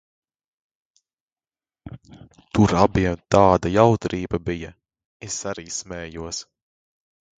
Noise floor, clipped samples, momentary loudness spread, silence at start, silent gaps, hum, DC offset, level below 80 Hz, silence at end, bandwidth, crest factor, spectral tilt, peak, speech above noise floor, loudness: under -90 dBFS; under 0.1%; 21 LU; 1.85 s; 5.05-5.20 s; none; under 0.1%; -42 dBFS; 1 s; 9.4 kHz; 24 dB; -5.5 dB/octave; 0 dBFS; over 69 dB; -21 LUFS